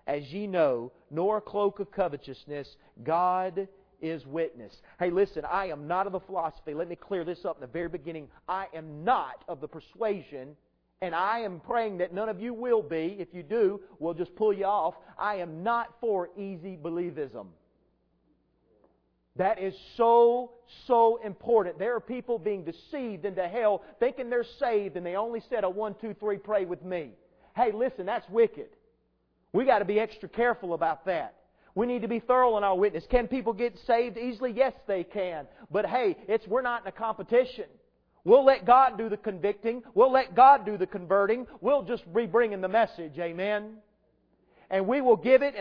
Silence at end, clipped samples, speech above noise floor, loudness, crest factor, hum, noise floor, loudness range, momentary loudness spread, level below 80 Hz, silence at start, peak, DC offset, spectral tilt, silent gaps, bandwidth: 0 s; under 0.1%; 44 dB; -28 LUFS; 22 dB; none; -72 dBFS; 9 LU; 15 LU; -56 dBFS; 0.05 s; -6 dBFS; under 0.1%; -8.5 dB/octave; none; 5.4 kHz